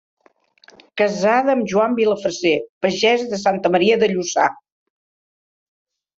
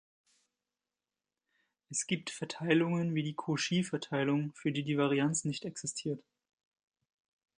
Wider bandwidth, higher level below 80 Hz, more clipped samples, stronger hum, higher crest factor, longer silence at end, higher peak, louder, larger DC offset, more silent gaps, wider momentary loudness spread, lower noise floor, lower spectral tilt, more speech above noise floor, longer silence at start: second, 7.8 kHz vs 10.5 kHz; first, -64 dBFS vs -78 dBFS; neither; neither; about the same, 18 dB vs 22 dB; first, 1.65 s vs 1.4 s; first, -2 dBFS vs -14 dBFS; first, -18 LUFS vs -33 LUFS; neither; first, 2.69-2.81 s vs none; second, 5 LU vs 9 LU; second, -56 dBFS vs under -90 dBFS; about the same, -4 dB/octave vs -4.5 dB/octave; second, 39 dB vs over 57 dB; second, 0.95 s vs 1.9 s